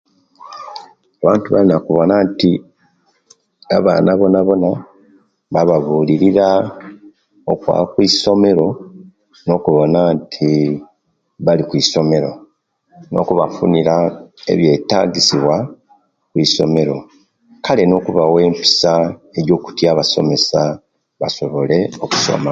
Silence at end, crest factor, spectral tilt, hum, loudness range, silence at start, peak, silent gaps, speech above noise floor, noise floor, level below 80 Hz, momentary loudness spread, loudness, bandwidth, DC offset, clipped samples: 0 s; 16 dB; -5.5 dB/octave; none; 2 LU; 0.45 s; 0 dBFS; none; 49 dB; -62 dBFS; -50 dBFS; 12 LU; -14 LUFS; 9 kHz; under 0.1%; under 0.1%